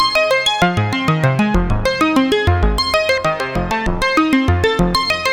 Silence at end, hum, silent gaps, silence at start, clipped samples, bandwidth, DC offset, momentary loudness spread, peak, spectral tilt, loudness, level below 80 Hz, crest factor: 0 s; none; none; 0 s; under 0.1%; over 20 kHz; under 0.1%; 4 LU; 0 dBFS; -5 dB/octave; -15 LUFS; -26 dBFS; 14 dB